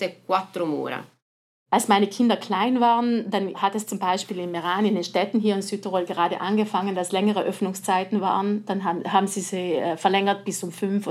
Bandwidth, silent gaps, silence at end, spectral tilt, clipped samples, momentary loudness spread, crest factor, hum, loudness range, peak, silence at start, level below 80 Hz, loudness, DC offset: 15 kHz; 1.22-1.66 s; 0 s; -4.5 dB/octave; under 0.1%; 7 LU; 20 dB; none; 2 LU; -4 dBFS; 0 s; -90 dBFS; -24 LUFS; under 0.1%